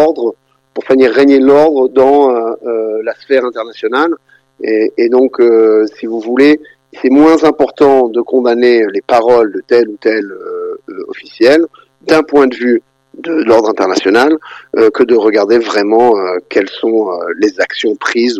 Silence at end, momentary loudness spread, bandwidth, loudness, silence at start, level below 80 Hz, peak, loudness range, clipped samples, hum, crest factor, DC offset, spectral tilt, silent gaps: 0 s; 12 LU; 9.8 kHz; -10 LUFS; 0 s; -52 dBFS; 0 dBFS; 3 LU; under 0.1%; none; 10 dB; under 0.1%; -5 dB/octave; none